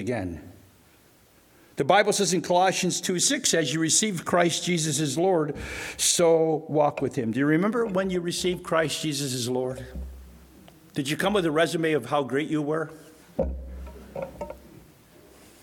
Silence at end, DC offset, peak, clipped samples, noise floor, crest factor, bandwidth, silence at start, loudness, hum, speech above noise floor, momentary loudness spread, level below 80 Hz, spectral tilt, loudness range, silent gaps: 0.95 s; under 0.1%; -6 dBFS; under 0.1%; -57 dBFS; 20 dB; 19 kHz; 0 s; -24 LUFS; none; 33 dB; 16 LU; -48 dBFS; -3.5 dB/octave; 6 LU; none